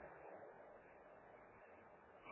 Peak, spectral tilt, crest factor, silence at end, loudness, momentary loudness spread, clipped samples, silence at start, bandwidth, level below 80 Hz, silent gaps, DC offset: -46 dBFS; -0.5 dB/octave; 16 dB; 0 s; -62 LUFS; 5 LU; under 0.1%; 0 s; 3.9 kHz; -82 dBFS; none; under 0.1%